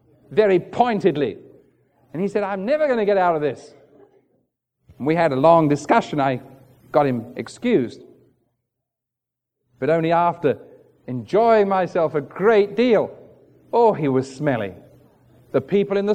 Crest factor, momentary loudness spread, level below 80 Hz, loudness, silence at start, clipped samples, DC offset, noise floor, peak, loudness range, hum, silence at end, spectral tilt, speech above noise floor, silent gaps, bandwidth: 20 dB; 11 LU; -64 dBFS; -20 LUFS; 0.3 s; under 0.1%; under 0.1%; -85 dBFS; -2 dBFS; 6 LU; none; 0 s; -7 dB/octave; 66 dB; none; 9.4 kHz